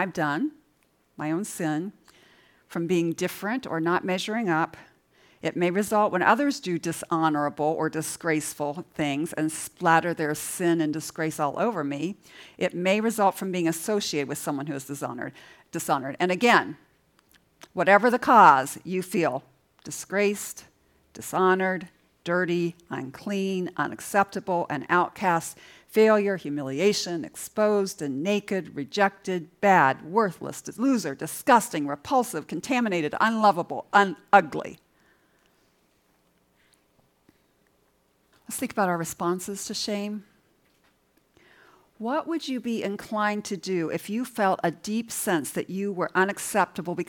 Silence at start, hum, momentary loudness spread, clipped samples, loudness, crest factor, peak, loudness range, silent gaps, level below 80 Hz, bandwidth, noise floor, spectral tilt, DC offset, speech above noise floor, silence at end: 0 s; none; 13 LU; under 0.1%; -25 LUFS; 24 dB; -2 dBFS; 9 LU; none; -70 dBFS; 18 kHz; -67 dBFS; -4.5 dB/octave; under 0.1%; 42 dB; 0.05 s